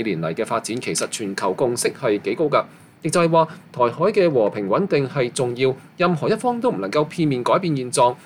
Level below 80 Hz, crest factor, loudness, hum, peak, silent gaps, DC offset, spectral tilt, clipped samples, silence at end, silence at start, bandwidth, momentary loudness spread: -62 dBFS; 16 dB; -21 LUFS; none; -4 dBFS; none; under 0.1%; -5 dB/octave; under 0.1%; 0.05 s; 0 s; 16 kHz; 6 LU